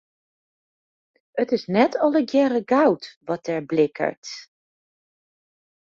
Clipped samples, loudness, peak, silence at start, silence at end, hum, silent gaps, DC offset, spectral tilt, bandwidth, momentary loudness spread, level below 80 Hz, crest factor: under 0.1%; -22 LUFS; -4 dBFS; 1.35 s; 1.4 s; none; 3.17-3.21 s, 4.17-4.22 s; under 0.1%; -6 dB/octave; 7.6 kHz; 13 LU; -68 dBFS; 20 dB